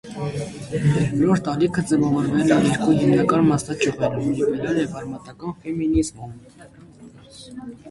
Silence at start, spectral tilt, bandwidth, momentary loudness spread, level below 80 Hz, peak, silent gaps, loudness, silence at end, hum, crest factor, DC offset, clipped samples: 0.05 s; -6.5 dB/octave; 11.5 kHz; 16 LU; -46 dBFS; -4 dBFS; none; -21 LUFS; 0 s; none; 18 dB; under 0.1%; under 0.1%